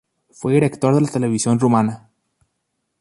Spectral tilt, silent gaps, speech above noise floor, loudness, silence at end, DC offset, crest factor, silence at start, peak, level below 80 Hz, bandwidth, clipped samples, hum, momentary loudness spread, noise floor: -6.5 dB/octave; none; 57 dB; -18 LUFS; 1 s; under 0.1%; 16 dB; 0.4 s; -4 dBFS; -58 dBFS; 11.5 kHz; under 0.1%; none; 9 LU; -74 dBFS